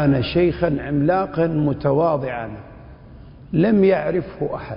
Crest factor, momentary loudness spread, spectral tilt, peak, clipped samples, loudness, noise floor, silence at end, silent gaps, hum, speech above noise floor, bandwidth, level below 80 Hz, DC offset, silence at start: 14 dB; 11 LU; -12.5 dB/octave; -6 dBFS; under 0.1%; -20 LUFS; -41 dBFS; 0 s; none; none; 22 dB; 5.4 kHz; -42 dBFS; under 0.1%; 0 s